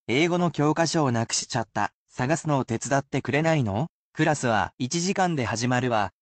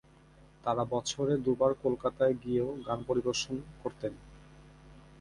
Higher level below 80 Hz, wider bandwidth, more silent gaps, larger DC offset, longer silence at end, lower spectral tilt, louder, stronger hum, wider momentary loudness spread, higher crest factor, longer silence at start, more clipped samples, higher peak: about the same, -60 dBFS vs -58 dBFS; second, 9 kHz vs 11.5 kHz; first, 1.94-2.06 s, 3.89-4.13 s, 4.74-4.78 s vs none; neither; about the same, 0.1 s vs 0.2 s; about the same, -5 dB/octave vs -5 dB/octave; first, -25 LUFS vs -32 LUFS; neither; second, 6 LU vs 10 LU; second, 14 dB vs 20 dB; second, 0.1 s vs 0.65 s; neither; first, -10 dBFS vs -14 dBFS